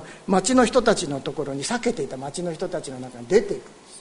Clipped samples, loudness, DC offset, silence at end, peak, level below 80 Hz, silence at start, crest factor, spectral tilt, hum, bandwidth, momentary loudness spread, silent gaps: under 0.1%; -23 LUFS; under 0.1%; 0 s; -4 dBFS; -48 dBFS; 0 s; 20 dB; -4.5 dB/octave; none; 11 kHz; 14 LU; none